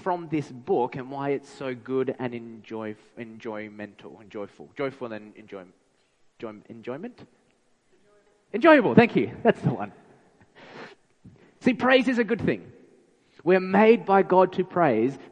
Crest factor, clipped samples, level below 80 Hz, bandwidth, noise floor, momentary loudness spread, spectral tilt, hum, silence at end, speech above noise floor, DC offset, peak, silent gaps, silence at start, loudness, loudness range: 22 dB; under 0.1%; -64 dBFS; 9.6 kHz; -66 dBFS; 22 LU; -7.5 dB/octave; none; 0.15 s; 42 dB; under 0.1%; -2 dBFS; none; 0.05 s; -23 LUFS; 16 LU